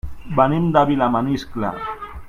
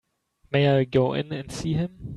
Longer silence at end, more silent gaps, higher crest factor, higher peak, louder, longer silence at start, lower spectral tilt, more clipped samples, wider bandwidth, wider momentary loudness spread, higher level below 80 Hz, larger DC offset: about the same, 0 s vs 0 s; neither; about the same, 20 dB vs 16 dB; first, 0 dBFS vs -8 dBFS; first, -19 LUFS vs -24 LUFS; second, 0.05 s vs 0.5 s; about the same, -8 dB/octave vs -7 dB/octave; neither; first, 13.5 kHz vs 11.5 kHz; about the same, 10 LU vs 10 LU; first, -40 dBFS vs -52 dBFS; neither